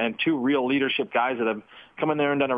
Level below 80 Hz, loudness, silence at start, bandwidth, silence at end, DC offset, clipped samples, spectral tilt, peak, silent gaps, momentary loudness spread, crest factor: -68 dBFS; -24 LUFS; 0 s; 4.9 kHz; 0 s; under 0.1%; under 0.1%; -8 dB/octave; -10 dBFS; none; 6 LU; 14 dB